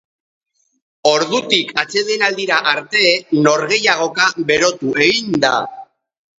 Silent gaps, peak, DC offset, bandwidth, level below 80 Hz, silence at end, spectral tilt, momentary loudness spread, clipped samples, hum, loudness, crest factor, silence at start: none; 0 dBFS; under 0.1%; 8 kHz; -60 dBFS; 0.55 s; -3 dB/octave; 4 LU; under 0.1%; none; -15 LUFS; 16 dB; 1.05 s